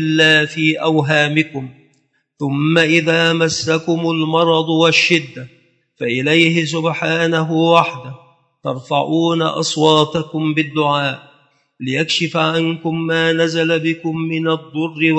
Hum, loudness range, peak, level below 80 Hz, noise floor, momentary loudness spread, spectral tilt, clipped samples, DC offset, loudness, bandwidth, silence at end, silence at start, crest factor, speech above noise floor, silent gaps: none; 3 LU; 0 dBFS; -62 dBFS; -62 dBFS; 11 LU; -5 dB/octave; under 0.1%; under 0.1%; -15 LUFS; 8.8 kHz; 0 s; 0 s; 16 dB; 46 dB; none